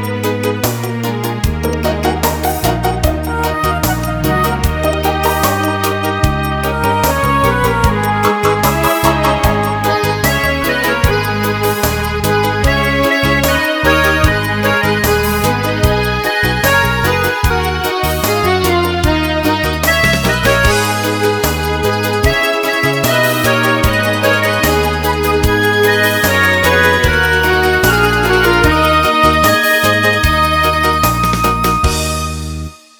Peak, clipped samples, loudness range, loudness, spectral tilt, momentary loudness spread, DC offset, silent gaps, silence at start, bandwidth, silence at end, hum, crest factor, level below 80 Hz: 0 dBFS; under 0.1%; 4 LU; -13 LUFS; -4.5 dB/octave; 5 LU; under 0.1%; none; 0 s; 19.5 kHz; 0.25 s; none; 12 dB; -24 dBFS